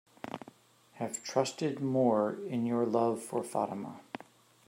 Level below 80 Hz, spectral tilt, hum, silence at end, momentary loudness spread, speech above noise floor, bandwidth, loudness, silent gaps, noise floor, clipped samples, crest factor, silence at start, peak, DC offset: -82 dBFS; -5.5 dB/octave; none; 0.5 s; 16 LU; 30 dB; 16 kHz; -32 LUFS; none; -62 dBFS; under 0.1%; 18 dB; 0.25 s; -14 dBFS; under 0.1%